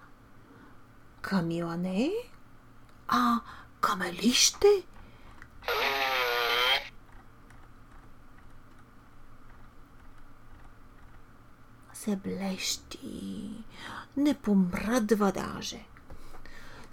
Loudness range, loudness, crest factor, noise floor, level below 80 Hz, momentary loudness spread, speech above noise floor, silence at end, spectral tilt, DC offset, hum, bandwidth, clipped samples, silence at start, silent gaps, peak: 11 LU; -28 LUFS; 24 dB; -53 dBFS; -52 dBFS; 21 LU; 24 dB; 0 s; -3.5 dB/octave; under 0.1%; none; 18 kHz; under 0.1%; 0 s; none; -8 dBFS